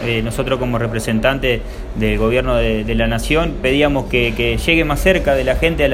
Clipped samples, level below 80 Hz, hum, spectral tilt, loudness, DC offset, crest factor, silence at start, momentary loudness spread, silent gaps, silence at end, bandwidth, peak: under 0.1%; -24 dBFS; none; -5.5 dB/octave; -16 LUFS; under 0.1%; 16 dB; 0 s; 5 LU; none; 0 s; 16 kHz; 0 dBFS